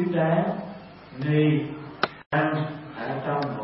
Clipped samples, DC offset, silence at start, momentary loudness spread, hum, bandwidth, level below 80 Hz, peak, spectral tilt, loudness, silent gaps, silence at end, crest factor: under 0.1%; under 0.1%; 0 s; 13 LU; none; 5.8 kHz; -62 dBFS; -4 dBFS; -11 dB/octave; -26 LUFS; 2.26-2.31 s; 0 s; 22 dB